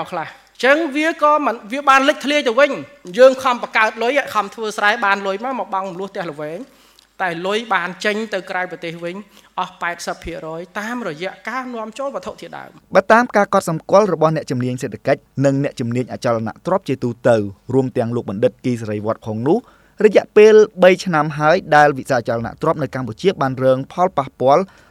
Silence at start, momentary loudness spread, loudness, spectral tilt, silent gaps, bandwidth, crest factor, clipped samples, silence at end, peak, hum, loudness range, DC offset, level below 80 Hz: 0 s; 14 LU; -17 LUFS; -5.5 dB/octave; none; 14.5 kHz; 18 dB; under 0.1%; 0.25 s; 0 dBFS; none; 10 LU; under 0.1%; -56 dBFS